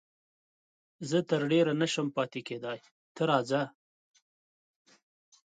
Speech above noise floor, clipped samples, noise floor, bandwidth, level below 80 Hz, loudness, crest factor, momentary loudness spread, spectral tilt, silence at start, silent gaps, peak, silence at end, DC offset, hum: over 60 dB; under 0.1%; under -90 dBFS; 9.4 kHz; -80 dBFS; -30 LUFS; 20 dB; 13 LU; -5.5 dB/octave; 1 s; 2.91-3.15 s; -12 dBFS; 1.9 s; under 0.1%; none